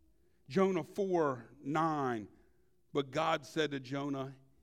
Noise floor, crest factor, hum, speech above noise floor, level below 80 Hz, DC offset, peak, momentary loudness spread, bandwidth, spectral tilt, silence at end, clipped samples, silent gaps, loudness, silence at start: -73 dBFS; 18 dB; none; 38 dB; -74 dBFS; under 0.1%; -18 dBFS; 9 LU; 14 kHz; -6 dB/octave; 0.25 s; under 0.1%; none; -35 LUFS; 0.5 s